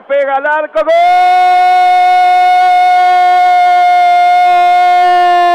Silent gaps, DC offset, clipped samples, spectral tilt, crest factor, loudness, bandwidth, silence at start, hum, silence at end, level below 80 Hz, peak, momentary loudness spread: none; under 0.1%; under 0.1%; -1.5 dB/octave; 4 dB; -8 LUFS; 10.5 kHz; 0.1 s; none; 0 s; -56 dBFS; -4 dBFS; 4 LU